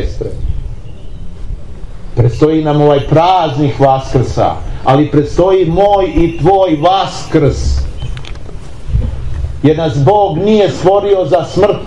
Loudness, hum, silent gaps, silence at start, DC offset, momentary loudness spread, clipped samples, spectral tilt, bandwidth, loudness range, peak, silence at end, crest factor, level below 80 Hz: -11 LUFS; none; none; 0 s; 4%; 19 LU; under 0.1%; -7.5 dB/octave; 11 kHz; 4 LU; 0 dBFS; 0 s; 12 dB; -22 dBFS